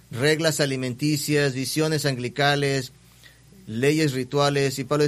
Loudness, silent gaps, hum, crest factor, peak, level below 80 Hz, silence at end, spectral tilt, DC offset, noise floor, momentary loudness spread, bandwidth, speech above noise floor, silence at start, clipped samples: -23 LUFS; none; none; 18 dB; -6 dBFS; -58 dBFS; 0 s; -4.5 dB/octave; under 0.1%; -51 dBFS; 5 LU; 15 kHz; 29 dB; 0.1 s; under 0.1%